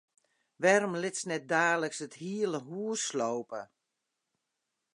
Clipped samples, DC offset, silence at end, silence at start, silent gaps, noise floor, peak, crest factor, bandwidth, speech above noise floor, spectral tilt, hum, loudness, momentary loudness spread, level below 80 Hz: under 0.1%; under 0.1%; 1.3 s; 0.6 s; none; -85 dBFS; -10 dBFS; 24 dB; 11 kHz; 54 dB; -3.5 dB/octave; none; -31 LUFS; 12 LU; -86 dBFS